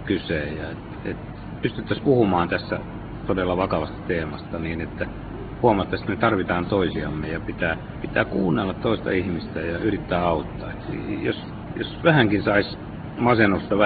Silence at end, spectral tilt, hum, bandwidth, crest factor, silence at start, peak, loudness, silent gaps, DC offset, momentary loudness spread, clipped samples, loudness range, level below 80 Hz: 0 s; -11 dB/octave; none; 4.8 kHz; 22 dB; 0 s; -2 dBFS; -24 LUFS; none; under 0.1%; 13 LU; under 0.1%; 2 LU; -42 dBFS